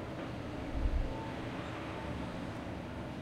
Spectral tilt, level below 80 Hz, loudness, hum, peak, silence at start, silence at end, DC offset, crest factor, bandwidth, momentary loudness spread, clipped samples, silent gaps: -7 dB/octave; -42 dBFS; -41 LUFS; none; -20 dBFS; 0 s; 0 s; under 0.1%; 18 dB; 13 kHz; 5 LU; under 0.1%; none